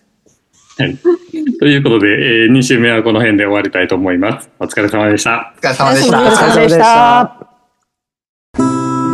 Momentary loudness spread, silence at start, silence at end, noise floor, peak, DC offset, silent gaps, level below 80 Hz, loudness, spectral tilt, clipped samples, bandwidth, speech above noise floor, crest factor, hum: 10 LU; 0.8 s; 0 s; -71 dBFS; 0 dBFS; under 0.1%; 8.29-8.54 s; -48 dBFS; -11 LUFS; -5 dB/octave; under 0.1%; 12.5 kHz; 61 dB; 12 dB; none